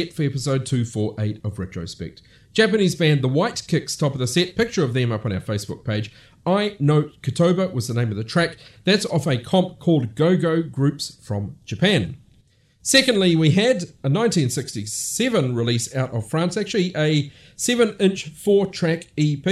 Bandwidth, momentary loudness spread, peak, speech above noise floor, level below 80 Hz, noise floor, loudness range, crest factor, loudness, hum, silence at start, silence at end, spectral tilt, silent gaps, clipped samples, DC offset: 14 kHz; 10 LU; -2 dBFS; 37 dB; -54 dBFS; -57 dBFS; 3 LU; 18 dB; -21 LUFS; none; 0 s; 0 s; -5 dB/octave; none; under 0.1%; under 0.1%